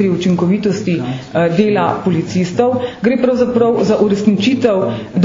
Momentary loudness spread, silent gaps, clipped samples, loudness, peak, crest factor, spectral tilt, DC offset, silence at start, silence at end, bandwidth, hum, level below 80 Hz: 4 LU; none; under 0.1%; -14 LUFS; 0 dBFS; 14 dB; -7 dB/octave; under 0.1%; 0 s; 0 s; 7.6 kHz; none; -48 dBFS